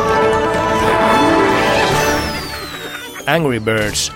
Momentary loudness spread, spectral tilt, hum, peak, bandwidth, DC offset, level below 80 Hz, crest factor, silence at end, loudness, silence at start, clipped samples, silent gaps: 13 LU; -4 dB/octave; none; 0 dBFS; 17 kHz; under 0.1%; -34 dBFS; 16 dB; 0 s; -15 LUFS; 0 s; under 0.1%; none